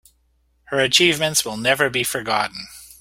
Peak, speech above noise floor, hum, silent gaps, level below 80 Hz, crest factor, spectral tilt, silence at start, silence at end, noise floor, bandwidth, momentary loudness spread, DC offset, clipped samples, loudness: -2 dBFS; 43 dB; none; none; -56 dBFS; 20 dB; -2 dB/octave; 0.7 s; 0.15 s; -63 dBFS; 16.5 kHz; 12 LU; under 0.1%; under 0.1%; -18 LUFS